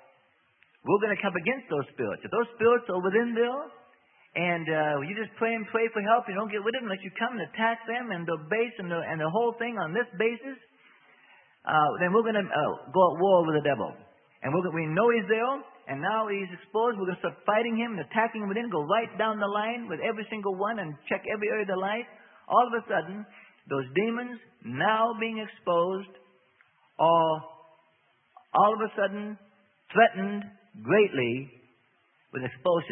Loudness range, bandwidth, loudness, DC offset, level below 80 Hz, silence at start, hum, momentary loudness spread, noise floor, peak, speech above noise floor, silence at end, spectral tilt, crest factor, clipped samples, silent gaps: 4 LU; 3.8 kHz; -28 LUFS; under 0.1%; -76 dBFS; 0.85 s; none; 13 LU; -68 dBFS; -6 dBFS; 40 dB; 0 s; -10 dB/octave; 22 dB; under 0.1%; none